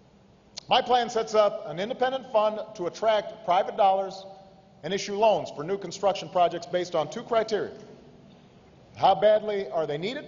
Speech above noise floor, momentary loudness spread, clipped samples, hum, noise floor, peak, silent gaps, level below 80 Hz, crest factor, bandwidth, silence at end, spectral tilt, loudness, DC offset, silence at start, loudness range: 31 dB; 11 LU; under 0.1%; none; -57 dBFS; -8 dBFS; none; -66 dBFS; 18 dB; 7.6 kHz; 0 s; -4 dB/octave; -26 LUFS; under 0.1%; 0.55 s; 3 LU